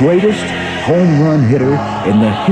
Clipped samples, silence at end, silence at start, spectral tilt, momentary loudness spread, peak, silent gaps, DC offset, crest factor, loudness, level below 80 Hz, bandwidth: under 0.1%; 0 s; 0 s; -7.5 dB/octave; 6 LU; 0 dBFS; none; under 0.1%; 12 dB; -12 LUFS; -42 dBFS; 10 kHz